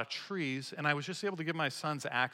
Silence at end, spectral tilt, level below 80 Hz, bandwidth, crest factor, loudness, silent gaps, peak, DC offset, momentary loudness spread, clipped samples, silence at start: 0 s; -4.5 dB/octave; -86 dBFS; 16.5 kHz; 20 dB; -35 LUFS; none; -16 dBFS; under 0.1%; 4 LU; under 0.1%; 0 s